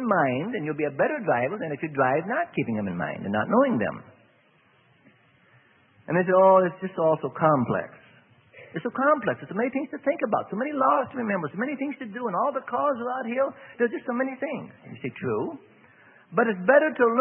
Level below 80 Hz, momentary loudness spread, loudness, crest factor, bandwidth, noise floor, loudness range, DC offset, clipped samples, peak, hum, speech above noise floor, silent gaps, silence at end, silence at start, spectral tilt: -70 dBFS; 12 LU; -25 LUFS; 20 dB; 3.4 kHz; -61 dBFS; 5 LU; under 0.1%; under 0.1%; -6 dBFS; none; 37 dB; none; 0 s; 0 s; -11 dB/octave